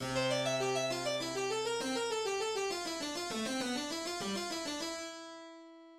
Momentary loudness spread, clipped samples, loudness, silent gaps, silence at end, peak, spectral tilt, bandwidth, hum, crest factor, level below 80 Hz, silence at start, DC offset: 11 LU; under 0.1%; -36 LUFS; none; 0 s; -22 dBFS; -3 dB/octave; 16.5 kHz; none; 16 dB; -68 dBFS; 0 s; under 0.1%